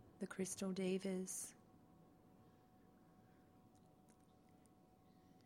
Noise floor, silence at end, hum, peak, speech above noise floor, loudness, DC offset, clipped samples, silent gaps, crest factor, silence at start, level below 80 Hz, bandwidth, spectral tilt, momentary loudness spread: -70 dBFS; 0.1 s; none; -32 dBFS; 26 dB; -45 LUFS; under 0.1%; under 0.1%; none; 20 dB; 0 s; -82 dBFS; 16.5 kHz; -5 dB/octave; 27 LU